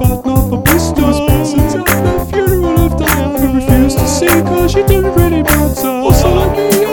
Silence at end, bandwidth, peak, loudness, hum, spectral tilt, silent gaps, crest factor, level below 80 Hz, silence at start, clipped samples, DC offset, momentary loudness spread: 0 s; 19.5 kHz; 0 dBFS; -11 LUFS; none; -5.5 dB/octave; none; 10 dB; -18 dBFS; 0 s; 0.5%; 0.2%; 3 LU